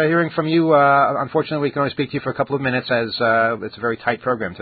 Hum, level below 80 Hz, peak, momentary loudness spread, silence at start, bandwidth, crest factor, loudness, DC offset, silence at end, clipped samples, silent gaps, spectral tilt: none; -56 dBFS; -2 dBFS; 9 LU; 0 s; 4.8 kHz; 16 dB; -19 LUFS; under 0.1%; 0 s; under 0.1%; none; -11.5 dB/octave